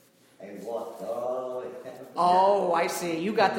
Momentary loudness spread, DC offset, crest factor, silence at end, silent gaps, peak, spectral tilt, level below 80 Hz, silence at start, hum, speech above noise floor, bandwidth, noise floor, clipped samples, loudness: 18 LU; under 0.1%; 20 dB; 0 s; none; -8 dBFS; -4.5 dB/octave; -76 dBFS; 0.4 s; none; 25 dB; 17 kHz; -48 dBFS; under 0.1%; -27 LUFS